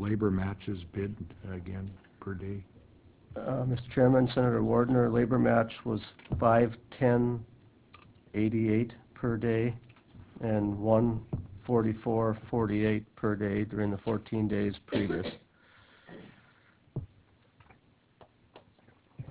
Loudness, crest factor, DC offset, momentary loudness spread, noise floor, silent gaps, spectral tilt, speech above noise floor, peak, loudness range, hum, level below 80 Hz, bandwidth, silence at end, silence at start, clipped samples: -30 LUFS; 20 dB; under 0.1%; 16 LU; -64 dBFS; none; -7.5 dB/octave; 35 dB; -12 dBFS; 12 LU; none; -52 dBFS; 4 kHz; 0.05 s; 0 s; under 0.1%